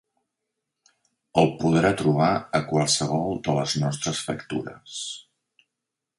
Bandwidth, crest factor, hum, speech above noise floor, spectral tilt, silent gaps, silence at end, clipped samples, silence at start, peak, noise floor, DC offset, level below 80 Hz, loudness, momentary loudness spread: 11.5 kHz; 20 dB; none; 61 dB; -5 dB/octave; none; 1 s; under 0.1%; 1.35 s; -4 dBFS; -85 dBFS; under 0.1%; -56 dBFS; -24 LUFS; 12 LU